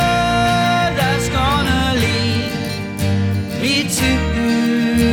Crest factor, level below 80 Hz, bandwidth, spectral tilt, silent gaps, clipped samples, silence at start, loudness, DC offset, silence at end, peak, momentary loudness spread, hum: 12 dB; -30 dBFS; 19 kHz; -5 dB/octave; none; under 0.1%; 0 s; -17 LUFS; under 0.1%; 0 s; -4 dBFS; 5 LU; none